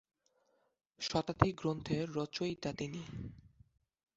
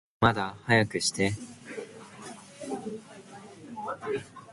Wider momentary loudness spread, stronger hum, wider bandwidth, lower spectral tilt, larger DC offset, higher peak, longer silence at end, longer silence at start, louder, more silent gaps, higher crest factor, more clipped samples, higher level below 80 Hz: second, 13 LU vs 20 LU; neither; second, 8 kHz vs 11.5 kHz; about the same, -5 dB/octave vs -4.5 dB/octave; neither; about the same, -8 dBFS vs -6 dBFS; first, 0.75 s vs 0 s; first, 1 s vs 0.2 s; second, -37 LUFS vs -29 LUFS; neither; about the same, 30 dB vs 26 dB; neither; about the same, -58 dBFS vs -56 dBFS